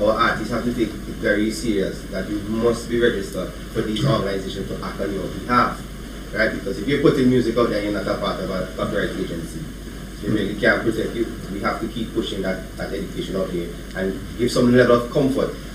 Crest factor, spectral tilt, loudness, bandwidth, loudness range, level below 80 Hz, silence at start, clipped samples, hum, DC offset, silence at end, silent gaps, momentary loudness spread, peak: 20 dB; -6 dB/octave; -22 LUFS; 16 kHz; 3 LU; -36 dBFS; 0 s; under 0.1%; none; under 0.1%; 0 s; none; 11 LU; -2 dBFS